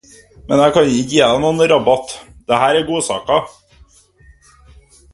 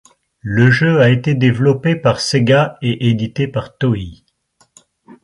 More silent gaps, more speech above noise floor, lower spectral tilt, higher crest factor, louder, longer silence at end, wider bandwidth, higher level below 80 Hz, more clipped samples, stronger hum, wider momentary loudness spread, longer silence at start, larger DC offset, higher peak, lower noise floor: neither; second, 34 dB vs 44 dB; second, -4.5 dB/octave vs -6.5 dB/octave; about the same, 16 dB vs 14 dB; about the same, -14 LUFS vs -15 LUFS; first, 1.65 s vs 1.1 s; about the same, 11.5 kHz vs 11.5 kHz; about the same, -46 dBFS vs -46 dBFS; neither; neither; about the same, 7 LU vs 9 LU; about the same, 0.45 s vs 0.45 s; neither; about the same, 0 dBFS vs 0 dBFS; second, -48 dBFS vs -58 dBFS